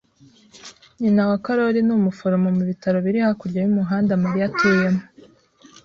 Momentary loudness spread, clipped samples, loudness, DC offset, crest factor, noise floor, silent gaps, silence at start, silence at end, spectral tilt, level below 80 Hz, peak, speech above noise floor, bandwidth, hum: 4 LU; under 0.1%; -20 LUFS; under 0.1%; 16 dB; -53 dBFS; none; 0.55 s; 0.8 s; -8 dB/octave; -58 dBFS; -6 dBFS; 34 dB; 7.2 kHz; none